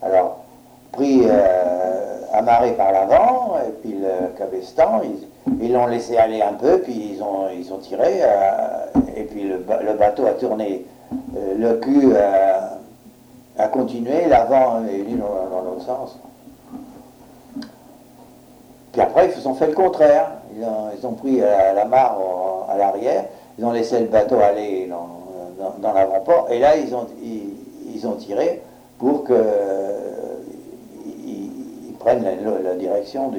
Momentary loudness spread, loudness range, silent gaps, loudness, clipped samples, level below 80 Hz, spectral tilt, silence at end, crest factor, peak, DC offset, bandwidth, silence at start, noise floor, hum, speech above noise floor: 17 LU; 6 LU; none; -19 LUFS; under 0.1%; -50 dBFS; -6.5 dB/octave; 0 s; 16 dB; -2 dBFS; under 0.1%; 16 kHz; 0 s; -46 dBFS; none; 28 dB